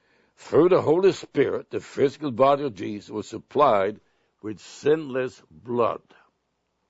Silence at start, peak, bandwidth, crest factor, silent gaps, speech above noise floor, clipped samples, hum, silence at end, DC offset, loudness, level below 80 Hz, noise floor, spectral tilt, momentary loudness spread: 0.45 s; -6 dBFS; 8 kHz; 18 dB; none; 51 dB; under 0.1%; none; 0.95 s; under 0.1%; -23 LUFS; -66 dBFS; -75 dBFS; -6.5 dB/octave; 15 LU